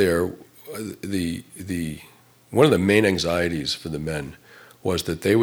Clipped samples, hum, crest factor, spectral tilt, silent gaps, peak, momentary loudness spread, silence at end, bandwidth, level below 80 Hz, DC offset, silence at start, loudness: under 0.1%; none; 20 dB; -5.5 dB/octave; none; -2 dBFS; 16 LU; 0 s; over 20 kHz; -48 dBFS; under 0.1%; 0 s; -23 LUFS